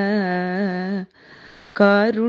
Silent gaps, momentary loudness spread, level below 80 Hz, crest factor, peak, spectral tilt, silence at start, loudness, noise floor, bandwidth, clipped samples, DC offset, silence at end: none; 17 LU; -64 dBFS; 18 dB; -2 dBFS; -8.5 dB/octave; 0 s; -20 LUFS; -46 dBFS; 6.6 kHz; under 0.1%; under 0.1%; 0 s